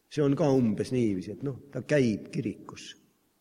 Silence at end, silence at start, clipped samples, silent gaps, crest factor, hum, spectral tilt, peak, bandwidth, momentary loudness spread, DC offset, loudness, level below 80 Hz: 0.5 s; 0.1 s; under 0.1%; none; 18 dB; none; -7 dB/octave; -12 dBFS; 12 kHz; 18 LU; under 0.1%; -28 LUFS; -62 dBFS